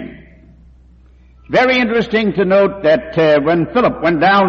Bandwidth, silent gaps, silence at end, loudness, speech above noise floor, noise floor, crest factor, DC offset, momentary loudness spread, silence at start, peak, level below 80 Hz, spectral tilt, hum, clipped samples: 7 kHz; none; 0 s; -13 LUFS; 32 dB; -45 dBFS; 12 dB; under 0.1%; 3 LU; 0 s; -2 dBFS; -44 dBFS; -7 dB/octave; none; under 0.1%